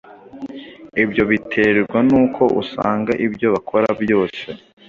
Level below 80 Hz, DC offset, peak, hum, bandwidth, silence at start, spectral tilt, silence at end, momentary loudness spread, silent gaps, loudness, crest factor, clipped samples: -52 dBFS; under 0.1%; -2 dBFS; none; 7.2 kHz; 0.05 s; -7.5 dB/octave; 0.35 s; 18 LU; none; -17 LUFS; 16 dB; under 0.1%